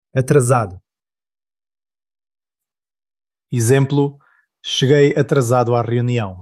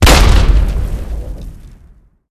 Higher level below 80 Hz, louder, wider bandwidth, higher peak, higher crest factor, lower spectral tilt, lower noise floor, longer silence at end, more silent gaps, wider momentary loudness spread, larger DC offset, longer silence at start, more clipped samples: second, -56 dBFS vs -14 dBFS; second, -16 LUFS vs -13 LUFS; about the same, 13.5 kHz vs 14.5 kHz; about the same, -2 dBFS vs 0 dBFS; about the same, 16 dB vs 12 dB; first, -6 dB/octave vs -4.5 dB/octave; first, under -90 dBFS vs -44 dBFS; second, 0 s vs 0.65 s; neither; second, 9 LU vs 21 LU; neither; first, 0.15 s vs 0 s; second, under 0.1% vs 0.4%